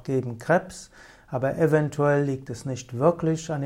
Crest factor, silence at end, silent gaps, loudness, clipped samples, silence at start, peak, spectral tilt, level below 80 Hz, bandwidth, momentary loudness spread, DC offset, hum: 18 dB; 0 s; none; -25 LUFS; under 0.1%; 0.05 s; -6 dBFS; -7 dB/octave; -56 dBFS; 13.5 kHz; 11 LU; under 0.1%; none